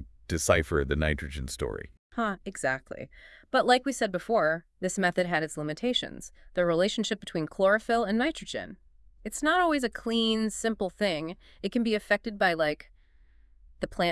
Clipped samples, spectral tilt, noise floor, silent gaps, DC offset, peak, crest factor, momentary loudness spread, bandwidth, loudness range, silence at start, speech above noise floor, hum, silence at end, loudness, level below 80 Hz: under 0.1%; -4 dB/octave; -58 dBFS; 1.99-2.10 s; under 0.1%; -8 dBFS; 20 dB; 13 LU; 12 kHz; 2 LU; 0 s; 30 dB; none; 0 s; -28 LUFS; -48 dBFS